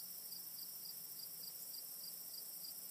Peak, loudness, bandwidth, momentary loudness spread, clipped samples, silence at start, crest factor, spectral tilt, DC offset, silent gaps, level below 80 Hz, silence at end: -36 dBFS; -47 LUFS; 15.5 kHz; 1 LU; under 0.1%; 0 s; 16 dB; 0.5 dB/octave; under 0.1%; none; under -90 dBFS; 0 s